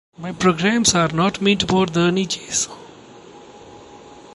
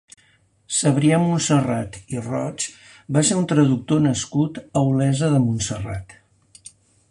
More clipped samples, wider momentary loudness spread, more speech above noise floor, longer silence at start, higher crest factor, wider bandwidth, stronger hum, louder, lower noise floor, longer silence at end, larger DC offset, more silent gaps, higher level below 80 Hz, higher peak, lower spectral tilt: neither; second, 8 LU vs 11 LU; second, 24 dB vs 39 dB; second, 0.2 s vs 0.7 s; about the same, 18 dB vs 16 dB; about the same, 11.5 kHz vs 11.5 kHz; neither; about the same, -18 LUFS vs -20 LUFS; second, -42 dBFS vs -59 dBFS; second, 0.1 s vs 1 s; neither; neither; about the same, -48 dBFS vs -50 dBFS; about the same, -2 dBFS vs -4 dBFS; second, -4 dB/octave vs -5.5 dB/octave